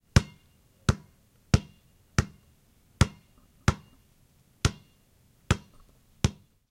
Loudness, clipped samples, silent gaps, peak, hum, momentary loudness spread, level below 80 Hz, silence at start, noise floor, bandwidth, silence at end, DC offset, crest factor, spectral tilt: -30 LUFS; under 0.1%; none; 0 dBFS; none; 5 LU; -40 dBFS; 0.15 s; -63 dBFS; 16 kHz; 0.4 s; under 0.1%; 30 dB; -5 dB/octave